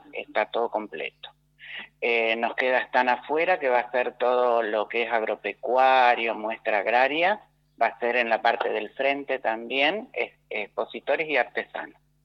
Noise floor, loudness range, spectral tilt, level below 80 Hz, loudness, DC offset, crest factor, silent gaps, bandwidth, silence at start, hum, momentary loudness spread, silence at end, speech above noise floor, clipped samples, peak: -44 dBFS; 3 LU; -4.5 dB/octave; -72 dBFS; -25 LUFS; under 0.1%; 18 dB; none; 6.6 kHz; 0.15 s; none; 10 LU; 0.35 s; 19 dB; under 0.1%; -8 dBFS